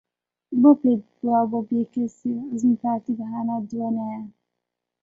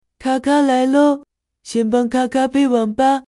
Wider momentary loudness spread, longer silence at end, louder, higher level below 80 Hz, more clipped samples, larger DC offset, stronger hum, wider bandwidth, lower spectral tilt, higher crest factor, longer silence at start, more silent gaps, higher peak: first, 12 LU vs 7 LU; first, 0.75 s vs 0.1 s; second, -23 LUFS vs -17 LUFS; second, -68 dBFS vs -54 dBFS; neither; neither; neither; second, 7.6 kHz vs 11.5 kHz; first, -9.5 dB/octave vs -5 dB/octave; first, 20 dB vs 12 dB; first, 0.5 s vs 0.2 s; neither; about the same, -4 dBFS vs -4 dBFS